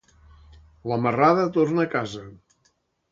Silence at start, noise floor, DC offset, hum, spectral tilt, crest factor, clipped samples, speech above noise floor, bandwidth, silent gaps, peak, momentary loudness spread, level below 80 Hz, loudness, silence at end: 0.85 s; -68 dBFS; under 0.1%; none; -7.5 dB/octave; 18 dB; under 0.1%; 46 dB; 7.6 kHz; none; -6 dBFS; 16 LU; -56 dBFS; -22 LUFS; 0.75 s